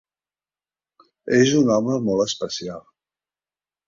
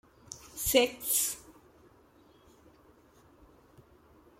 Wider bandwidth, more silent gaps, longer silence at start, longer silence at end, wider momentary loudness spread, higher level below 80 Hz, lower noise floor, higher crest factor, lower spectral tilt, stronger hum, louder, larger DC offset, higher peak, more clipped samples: second, 7.6 kHz vs 16.5 kHz; neither; first, 1.25 s vs 0.3 s; second, 1.05 s vs 2.9 s; about the same, 19 LU vs 21 LU; about the same, -60 dBFS vs -58 dBFS; first, under -90 dBFS vs -61 dBFS; second, 20 dB vs 26 dB; first, -5 dB/octave vs -1.5 dB/octave; first, 50 Hz at -50 dBFS vs none; first, -20 LUFS vs -29 LUFS; neither; first, -4 dBFS vs -10 dBFS; neither